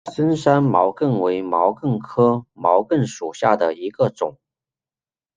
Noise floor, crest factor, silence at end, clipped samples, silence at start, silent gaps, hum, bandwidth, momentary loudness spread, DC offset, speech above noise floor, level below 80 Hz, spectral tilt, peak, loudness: under -90 dBFS; 18 dB; 1.05 s; under 0.1%; 0.05 s; none; none; 9.6 kHz; 6 LU; under 0.1%; over 71 dB; -62 dBFS; -7.5 dB/octave; -2 dBFS; -19 LUFS